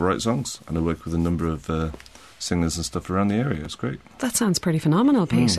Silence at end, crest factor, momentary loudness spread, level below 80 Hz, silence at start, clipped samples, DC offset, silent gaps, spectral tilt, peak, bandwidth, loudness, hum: 0 s; 16 dB; 11 LU; -42 dBFS; 0 s; under 0.1%; 0.1%; none; -5.5 dB/octave; -6 dBFS; 13.5 kHz; -24 LUFS; none